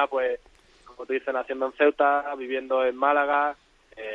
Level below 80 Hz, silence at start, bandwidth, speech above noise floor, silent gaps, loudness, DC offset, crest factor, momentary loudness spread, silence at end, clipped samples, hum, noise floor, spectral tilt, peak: -64 dBFS; 0 s; 7.2 kHz; 29 dB; none; -25 LUFS; under 0.1%; 18 dB; 13 LU; 0 s; under 0.1%; none; -53 dBFS; -4.5 dB/octave; -8 dBFS